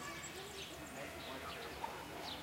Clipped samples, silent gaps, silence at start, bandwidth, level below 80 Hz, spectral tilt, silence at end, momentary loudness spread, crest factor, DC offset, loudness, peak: under 0.1%; none; 0 s; 16 kHz; -64 dBFS; -3 dB/octave; 0 s; 2 LU; 18 dB; under 0.1%; -47 LUFS; -30 dBFS